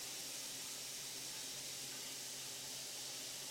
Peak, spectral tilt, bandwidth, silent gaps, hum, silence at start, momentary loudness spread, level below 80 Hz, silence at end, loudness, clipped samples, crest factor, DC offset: -34 dBFS; 0 dB/octave; 16.5 kHz; none; none; 0 s; 1 LU; -84 dBFS; 0 s; -44 LUFS; under 0.1%; 14 dB; under 0.1%